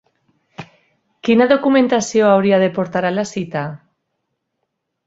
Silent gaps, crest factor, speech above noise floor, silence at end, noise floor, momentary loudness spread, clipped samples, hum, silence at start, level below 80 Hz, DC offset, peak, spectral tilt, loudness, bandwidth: none; 18 dB; 59 dB; 1.3 s; -74 dBFS; 16 LU; under 0.1%; none; 0.6 s; -60 dBFS; under 0.1%; 0 dBFS; -5.5 dB/octave; -16 LUFS; 8 kHz